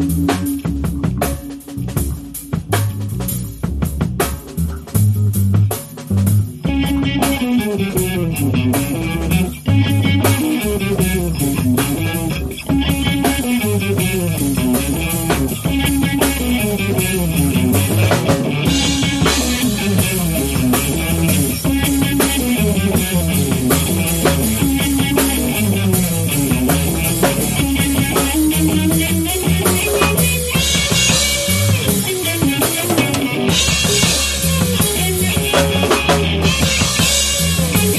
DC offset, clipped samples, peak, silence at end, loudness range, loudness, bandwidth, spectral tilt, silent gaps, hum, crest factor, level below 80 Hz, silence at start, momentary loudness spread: under 0.1%; under 0.1%; -2 dBFS; 0 s; 4 LU; -16 LUFS; 13.5 kHz; -4 dB/octave; none; none; 14 dB; -28 dBFS; 0 s; 7 LU